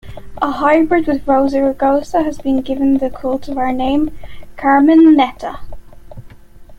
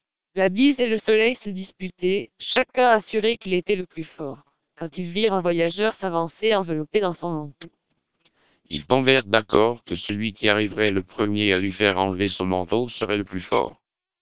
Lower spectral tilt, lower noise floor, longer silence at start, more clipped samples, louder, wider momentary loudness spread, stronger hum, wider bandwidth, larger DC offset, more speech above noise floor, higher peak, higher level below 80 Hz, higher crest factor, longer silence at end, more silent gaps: second, -6.5 dB/octave vs -9.5 dB/octave; second, -37 dBFS vs -68 dBFS; second, 0.05 s vs 0.35 s; neither; first, -14 LUFS vs -22 LUFS; about the same, 12 LU vs 14 LU; neither; first, 8.4 kHz vs 4 kHz; second, under 0.1% vs 0.5%; second, 23 dB vs 46 dB; about the same, -2 dBFS vs 0 dBFS; first, -38 dBFS vs -52 dBFS; second, 12 dB vs 22 dB; second, 0.05 s vs 0.5 s; neither